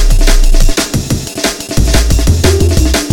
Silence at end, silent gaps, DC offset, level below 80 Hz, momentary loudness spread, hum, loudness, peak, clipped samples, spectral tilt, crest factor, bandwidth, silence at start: 0 s; none; under 0.1%; -10 dBFS; 6 LU; none; -12 LUFS; 0 dBFS; under 0.1%; -4.5 dB/octave; 8 dB; 17.5 kHz; 0 s